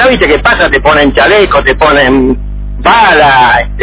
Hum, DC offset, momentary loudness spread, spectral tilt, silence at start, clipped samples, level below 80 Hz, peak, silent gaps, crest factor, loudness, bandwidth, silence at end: 50 Hz at -20 dBFS; under 0.1%; 7 LU; -8.5 dB/octave; 0 s; 3%; -20 dBFS; 0 dBFS; none; 6 dB; -6 LUFS; 4 kHz; 0 s